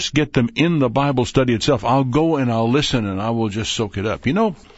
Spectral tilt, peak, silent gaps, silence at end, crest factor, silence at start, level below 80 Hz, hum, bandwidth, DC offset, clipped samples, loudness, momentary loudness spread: -5.5 dB/octave; -2 dBFS; none; 0.2 s; 16 dB; 0 s; -42 dBFS; none; 8 kHz; under 0.1%; under 0.1%; -19 LUFS; 5 LU